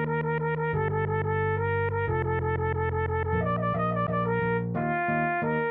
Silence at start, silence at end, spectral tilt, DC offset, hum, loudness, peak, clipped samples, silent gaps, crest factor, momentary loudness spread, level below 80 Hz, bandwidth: 0 s; 0 s; -11 dB/octave; under 0.1%; none; -27 LUFS; -14 dBFS; under 0.1%; none; 12 dB; 2 LU; -46 dBFS; 4 kHz